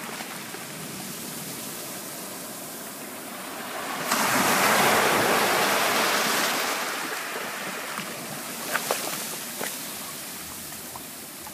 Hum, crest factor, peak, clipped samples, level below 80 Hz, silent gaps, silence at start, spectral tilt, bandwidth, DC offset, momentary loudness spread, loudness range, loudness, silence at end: none; 20 dB; -6 dBFS; under 0.1%; -68 dBFS; none; 0 s; -1.5 dB/octave; 15.5 kHz; under 0.1%; 15 LU; 12 LU; -26 LUFS; 0 s